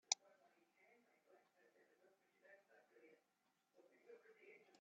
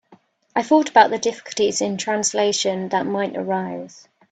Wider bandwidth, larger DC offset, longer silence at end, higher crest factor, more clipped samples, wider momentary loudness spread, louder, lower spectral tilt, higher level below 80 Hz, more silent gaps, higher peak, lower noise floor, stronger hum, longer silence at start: second, 7.2 kHz vs 9.4 kHz; neither; second, 0.15 s vs 0.45 s; first, 38 dB vs 20 dB; neither; first, 23 LU vs 11 LU; second, -45 LUFS vs -20 LUFS; second, 3 dB/octave vs -3 dB/octave; second, under -90 dBFS vs -66 dBFS; neither; second, -20 dBFS vs 0 dBFS; first, -86 dBFS vs -54 dBFS; neither; about the same, 0.1 s vs 0.1 s